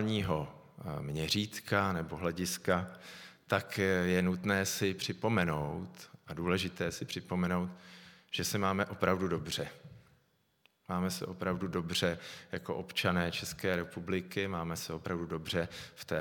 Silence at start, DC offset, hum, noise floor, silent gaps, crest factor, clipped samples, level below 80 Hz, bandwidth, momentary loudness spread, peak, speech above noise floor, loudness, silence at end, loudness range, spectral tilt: 0 s; under 0.1%; none; -73 dBFS; none; 24 dB; under 0.1%; -60 dBFS; 19 kHz; 12 LU; -12 dBFS; 38 dB; -34 LUFS; 0 s; 4 LU; -4.5 dB/octave